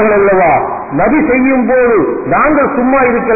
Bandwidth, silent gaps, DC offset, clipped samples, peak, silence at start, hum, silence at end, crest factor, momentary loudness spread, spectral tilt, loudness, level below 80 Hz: 2.7 kHz; none; under 0.1%; under 0.1%; -2 dBFS; 0 s; none; 0 s; 8 dB; 4 LU; -16.5 dB/octave; -10 LUFS; -36 dBFS